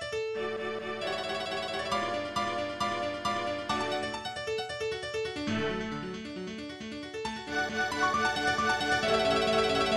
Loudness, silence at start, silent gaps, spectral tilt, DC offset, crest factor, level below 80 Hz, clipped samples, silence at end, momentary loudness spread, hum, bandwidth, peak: -31 LUFS; 0 s; none; -3.5 dB/octave; under 0.1%; 18 dB; -56 dBFS; under 0.1%; 0 s; 11 LU; none; 14.5 kHz; -14 dBFS